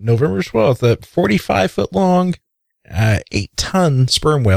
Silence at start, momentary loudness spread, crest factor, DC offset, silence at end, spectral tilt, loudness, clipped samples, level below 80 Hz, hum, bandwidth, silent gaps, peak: 0 s; 6 LU; 12 dB; under 0.1%; 0 s; -6 dB/octave; -16 LUFS; under 0.1%; -38 dBFS; none; 15 kHz; none; -2 dBFS